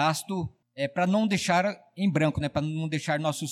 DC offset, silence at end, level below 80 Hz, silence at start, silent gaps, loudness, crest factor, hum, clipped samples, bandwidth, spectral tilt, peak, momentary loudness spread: under 0.1%; 0 s; -56 dBFS; 0 s; none; -27 LUFS; 14 dB; none; under 0.1%; 15 kHz; -5.5 dB/octave; -12 dBFS; 9 LU